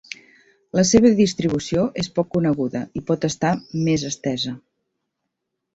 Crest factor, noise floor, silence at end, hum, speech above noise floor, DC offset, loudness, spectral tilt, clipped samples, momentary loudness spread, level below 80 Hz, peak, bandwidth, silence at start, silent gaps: 20 dB; -79 dBFS; 1.15 s; none; 59 dB; under 0.1%; -21 LUFS; -5 dB/octave; under 0.1%; 13 LU; -52 dBFS; -2 dBFS; 8 kHz; 0.75 s; none